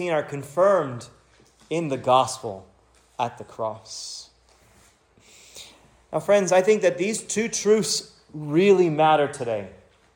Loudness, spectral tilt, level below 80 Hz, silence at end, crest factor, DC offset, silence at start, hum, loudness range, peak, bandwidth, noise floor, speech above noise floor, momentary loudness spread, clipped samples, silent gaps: -22 LUFS; -4.5 dB/octave; -64 dBFS; 0.4 s; 18 dB; under 0.1%; 0 s; none; 14 LU; -6 dBFS; 17.5 kHz; -58 dBFS; 36 dB; 20 LU; under 0.1%; none